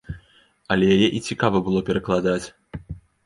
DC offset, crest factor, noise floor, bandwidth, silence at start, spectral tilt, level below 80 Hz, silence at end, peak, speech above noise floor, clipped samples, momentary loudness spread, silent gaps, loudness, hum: under 0.1%; 20 dB; -57 dBFS; 11.5 kHz; 0.1 s; -6 dB/octave; -46 dBFS; 0.3 s; -2 dBFS; 37 dB; under 0.1%; 21 LU; none; -21 LUFS; none